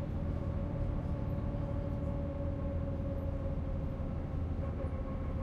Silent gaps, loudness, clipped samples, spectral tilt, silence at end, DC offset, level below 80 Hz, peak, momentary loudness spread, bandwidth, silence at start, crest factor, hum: none; -38 LUFS; under 0.1%; -10 dB/octave; 0 s; under 0.1%; -40 dBFS; -24 dBFS; 2 LU; 5 kHz; 0 s; 12 dB; none